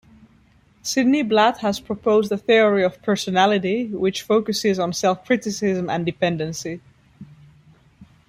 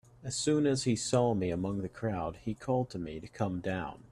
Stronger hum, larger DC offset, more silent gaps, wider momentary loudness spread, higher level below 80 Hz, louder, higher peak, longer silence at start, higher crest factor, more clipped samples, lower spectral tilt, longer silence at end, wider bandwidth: neither; neither; neither; about the same, 8 LU vs 10 LU; about the same, -58 dBFS vs -58 dBFS; first, -20 LUFS vs -33 LUFS; first, -4 dBFS vs -16 dBFS; first, 0.85 s vs 0.2 s; about the same, 18 dB vs 18 dB; neither; about the same, -4.5 dB/octave vs -5.5 dB/octave; first, 0.25 s vs 0.05 s; first, 15.5 kHz vs 12.5 kHz